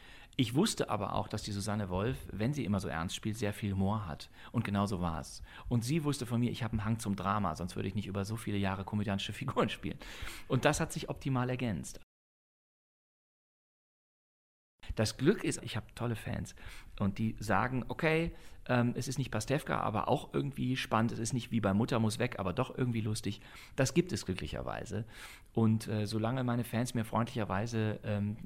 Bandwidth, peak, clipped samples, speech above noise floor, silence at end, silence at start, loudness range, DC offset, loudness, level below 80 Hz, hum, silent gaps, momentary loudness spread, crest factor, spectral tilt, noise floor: 16 kHz; -10 dBFS; under 0.1%; over 56 dB; 0 s; 0 s; 4 LU; under 0.1%; -35 LUFS; -54 dBFS; none; 12.03-14.78 s; 10 LU; 24 dB; -5.5 dB/octave; under -90 dBFS